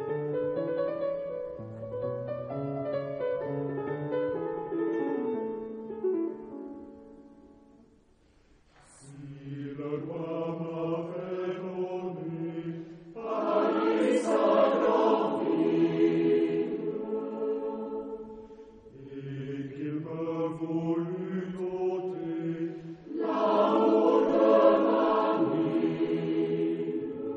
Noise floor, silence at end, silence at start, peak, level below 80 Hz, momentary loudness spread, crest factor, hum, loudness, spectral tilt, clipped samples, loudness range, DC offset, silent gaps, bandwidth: -62 dBFS; 0 s; 0 s; -10 dBFS; -68 dBFS; 16 LU; 20 dB; none; -29 LUFS; -7.5 dB/octave; under 0.1%; 13 LU; under 0.1%; none; 9.6 kHz